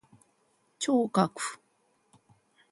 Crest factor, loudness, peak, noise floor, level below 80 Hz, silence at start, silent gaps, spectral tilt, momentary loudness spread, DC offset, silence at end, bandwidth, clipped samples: 22 dB; -29 LUFS; -12 dBFS; -71 dBFS; -78 dBFS; 0.8 s; none; -5 dB/octave; 11 LU; under 0.1%; 1.15 s; 11.5 kHz; under 0.1%